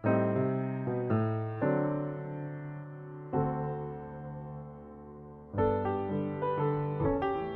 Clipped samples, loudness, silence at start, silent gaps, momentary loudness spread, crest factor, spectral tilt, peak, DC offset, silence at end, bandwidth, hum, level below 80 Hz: under 0.1%; -33 LUFS; 0 s; none; 15 LU; 16 dB; -8.5 dB/octave; -16 dBFS; under 0.1%; 0 s; 4.3 kHz; none; -56 dBFS